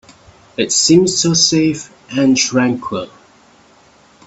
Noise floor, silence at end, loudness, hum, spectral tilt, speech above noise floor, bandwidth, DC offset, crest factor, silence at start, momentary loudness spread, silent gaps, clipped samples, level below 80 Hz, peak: -48 dBFS; 1.2 s; -13 LUFS; none; -3.5 dB/octave; 34 dB; 8.4 kHz; under 0.1%; 16 dB; 0.6 s; 15 LU; none; under 0.1%; -52 dBFS; 0 dBFS